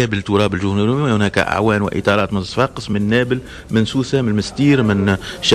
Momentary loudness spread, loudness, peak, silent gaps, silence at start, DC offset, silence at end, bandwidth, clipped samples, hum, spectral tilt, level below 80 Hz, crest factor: 5 LU; -17 LUFS; -2 dBFS; none; 0 s; under 0.1%; 0 s; 12.5 kHz; under 0.1%; none; -6 dB/octave; -42 dBFS; 14 dB